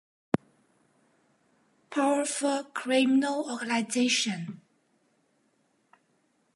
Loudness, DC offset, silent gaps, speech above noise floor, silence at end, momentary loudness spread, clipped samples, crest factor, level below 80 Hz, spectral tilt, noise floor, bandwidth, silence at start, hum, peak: -28 LUFS; under 0.1%; none; 44 dB; 2 s; 10 LU; under 0.1%; 24 dB; -72 dBFS; -3.5 dB/octave; -71 dBFS; 11.5 kHz; 0.35 s; none; -6 dBFS